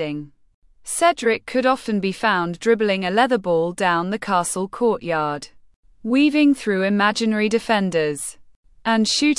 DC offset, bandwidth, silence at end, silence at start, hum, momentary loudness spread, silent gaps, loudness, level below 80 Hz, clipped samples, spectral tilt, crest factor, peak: under 0.1%; 12 kHz; 0 s; 0 s; none; 9 LU; 0.54-0.62 s, 5.76-5.83 s, 8.56-8.63 s; -20 LUFS; -56 dBFS; under 0.1%; -4 dB/octave; 16 dB; -4 dBFS